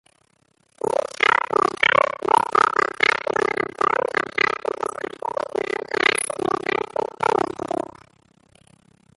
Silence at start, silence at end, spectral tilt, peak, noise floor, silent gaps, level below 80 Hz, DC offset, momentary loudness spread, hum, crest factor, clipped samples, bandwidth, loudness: 0.85 s; 1.4 s; -2.5 dB/octave; -2 dBFS; -64 dBFS; none; -60 dBFS; under 0.1%; 10 LU; none; 22 dB; under 0.1%; 12 kHz; -21 LUFS